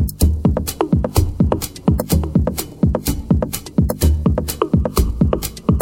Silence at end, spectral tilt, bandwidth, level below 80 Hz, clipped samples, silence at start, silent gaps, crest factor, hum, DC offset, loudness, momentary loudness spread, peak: 0 s; -6.5 dB/octave; 17 kHz; -22 dBFS; under 0.1%; 0 s; none; 16 dB; none; under 0.1%; -18 LUFS; 3 LU; 0 dBFS